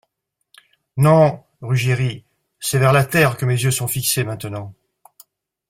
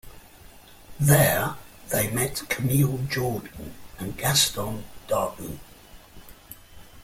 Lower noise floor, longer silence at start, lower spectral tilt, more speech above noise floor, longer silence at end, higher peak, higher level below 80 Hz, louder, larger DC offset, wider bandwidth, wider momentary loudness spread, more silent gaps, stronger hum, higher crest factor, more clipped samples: first, -75 dBFS vs -48 dBFS; first, 0.95 s vs 0.05 s; about the same, -5 dB/octave vs -4 dB/octave; first, 58 dB vs 24 dB; first, 0.95 s vs 0 s; about the same, -2 dBFS vs -4 dBFS; about the same, -50 dBFS vs -48 dBFS; first, -18 LUFS vs -24 LUFS; neither; about the same, 16.5 kHz vs 16.5 kHz; second, 18 LU vs 22 LU; neither; neither; about the same, 18 dB vs 22 dB; neither